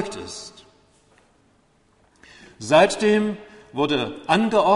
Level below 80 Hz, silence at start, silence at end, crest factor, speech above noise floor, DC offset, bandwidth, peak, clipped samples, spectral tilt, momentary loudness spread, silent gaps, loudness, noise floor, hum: -58 dBFS; 0 s; 0 s; 20 dB; 41 dB; under 0.1%; 11.5 kHz; -4 dBFS; under 0.1%; -4.5 dB/octave; 20 LU; none; -20 LUFS; -60 dBFS; none